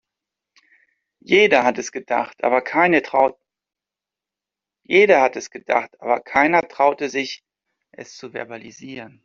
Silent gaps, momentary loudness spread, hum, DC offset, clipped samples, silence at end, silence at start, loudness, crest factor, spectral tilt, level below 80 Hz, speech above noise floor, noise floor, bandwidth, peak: none; 21 LU; none; under 0.1%; under 0.1%; 0.15 s; 1.3 s; -18 LUFS; 20 dB; -4 dB/octave; -64 dBFS; 69 dB; -88 dBFS; 7.4 kHz; -2 dBFS